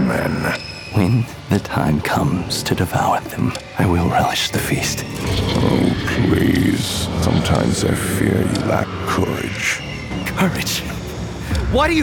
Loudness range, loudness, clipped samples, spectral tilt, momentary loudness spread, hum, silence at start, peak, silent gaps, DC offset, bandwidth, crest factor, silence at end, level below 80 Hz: 2 LU; -19 LUFS; under 0.1%; -5 dB/octave; 7 LU; none; 0 s; -4 dBFS; none; under 0.1%; over 20 kHz; 14 dB; 0 s; -34 dBFS